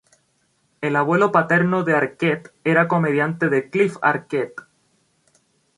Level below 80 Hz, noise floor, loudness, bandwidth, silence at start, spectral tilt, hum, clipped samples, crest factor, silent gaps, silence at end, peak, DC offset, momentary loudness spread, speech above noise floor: -66 dBFS; -66 dBFS; -19 LUFS; 11 kHz; 0.8 s; -7.5 dB/octave; none; under 0.1%; 20 dB; none; 1.15 s; -2 dBFS; under 0.1%; 9 LU; 46 dB